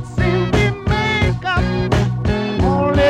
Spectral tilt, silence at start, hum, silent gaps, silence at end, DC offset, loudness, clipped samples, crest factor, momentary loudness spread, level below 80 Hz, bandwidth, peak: -6.5 dB/octave; 0 s; none; none; 0 s; under 0.1%; -17 LUFS; under 0.1%; 10 dB; 3 LU; -26 dBFS; 10 kHz; -6 dBFS